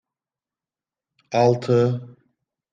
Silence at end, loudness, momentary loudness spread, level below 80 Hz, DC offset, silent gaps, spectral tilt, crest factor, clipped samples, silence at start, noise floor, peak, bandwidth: 0.65 s; -21 LUFS; 8 LU; -66 dBFS; under 0.1%; none; -7.5 dB/octave; 20 dB; under 0.1%; 1.3 s; under -90 dBFS; -4 dBFS; 7.6 kHz